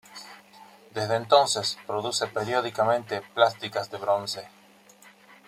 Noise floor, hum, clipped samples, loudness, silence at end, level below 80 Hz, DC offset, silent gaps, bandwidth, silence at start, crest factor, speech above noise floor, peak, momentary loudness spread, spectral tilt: -54 dBFS; none; under 0.1%; -26 LUFS; 1 s; -72 dBFS; under 0.1%; none; 15.5 kHz; 0.1 s; 24 dB; 28 dB; -4 dBFS; 16 LU; -3 dB/octave